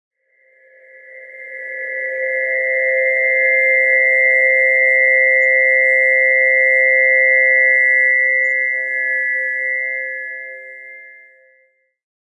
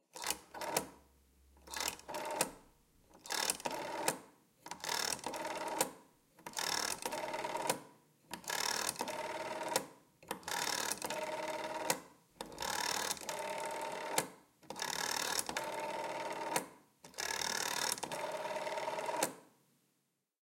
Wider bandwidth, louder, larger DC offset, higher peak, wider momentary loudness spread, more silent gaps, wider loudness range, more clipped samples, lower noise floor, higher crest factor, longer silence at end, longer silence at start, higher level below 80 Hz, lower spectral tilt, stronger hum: second, 8.2 kHz vs 17 kHz; first, -12 LUFS vs -38 LUFS; neither; first, -4 dBFS vs -14 dBFS; first, 16 LU vs 11 LU; neither; first, 9 LU vs 2 LU; neither; second, -59 dBFS vs -82 dBFS; second, 12 dB vs 26 dB; first, 1.15 s vs 0.95 s; first, 1.1 s vs 0.15 s; second, under -90 dBFS vs -74 dBFS; about the same, -0.5 dB/octave vs -1 dB/octave; neither